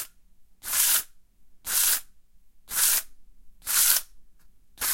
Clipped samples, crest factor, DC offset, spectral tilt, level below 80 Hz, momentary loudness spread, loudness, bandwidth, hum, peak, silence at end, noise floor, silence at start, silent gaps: under 0.1%; 26 dB; under 0.1%; 3 dB/octave; -58 dBFS; 19 LU; -22 LUFS; 16.5 kHz; none; -2 dBFS; 0 s; -52 dBFS; 0 s; none